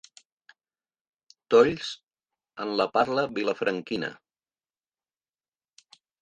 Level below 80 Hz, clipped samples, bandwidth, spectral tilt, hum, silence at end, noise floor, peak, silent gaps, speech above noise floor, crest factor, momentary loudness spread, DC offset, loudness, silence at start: -66 dBFS; under 0.1%; 8.8 kHz; -5 dB/octave; none; 2.1 s; under -90 dBFS; -6 dBFS; none; over 65 dB; 22 dB; 16 LU; under 0.1%; -26 LUFS; 1.5 s